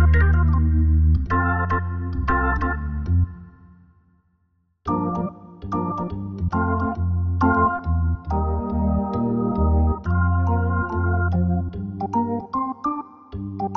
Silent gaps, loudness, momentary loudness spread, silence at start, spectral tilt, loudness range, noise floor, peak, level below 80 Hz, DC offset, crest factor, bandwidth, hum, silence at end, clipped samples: none; -22 LUFS; 10 LU; 0 s; -10.5 dB/octave; 6 LU; -66 dBFS; -6 dBFS; -26 dBFS; under 0.1%; 16 dB; 3.5 kHz; none; 0 s; under 0.1%